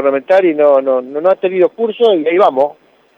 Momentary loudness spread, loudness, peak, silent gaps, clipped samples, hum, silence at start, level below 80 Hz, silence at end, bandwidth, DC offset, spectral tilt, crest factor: 5 LU; -12 LUFS; -2 dBFS; none; under 0.1%; none; 0 s; -68 dBFS; 0.45 s; 5.8 kHz; under 0.1%; -7 dB/octave; 12 dB